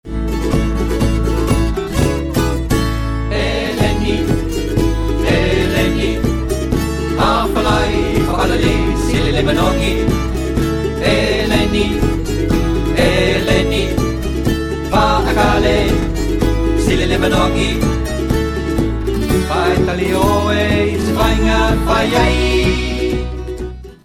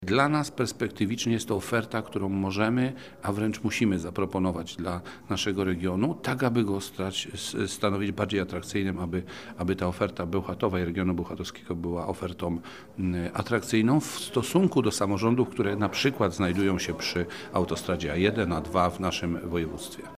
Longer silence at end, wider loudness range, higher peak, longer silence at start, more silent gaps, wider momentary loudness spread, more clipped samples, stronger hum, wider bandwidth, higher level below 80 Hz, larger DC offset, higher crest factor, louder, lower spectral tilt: about the same, 0.1 s vs 0 s; about the same, 2 LU vs 4 LU; first, 0 dBFS vs -8 dBFS; about the same, 0.05 s vs 0 s; neither; second, 5 LU vs 8 LU; neither; neither; about the same, 16 kHz vs 15.5 kHz; first, -20 dBFS vs -56 dBFS; second, under 0.1% vs 0.1%; second, 14 dB vs 20 dB; first, -16 LUFS vs -28 LUFS; about the same, -5.5 dB/octave vs -5.5 dB/octave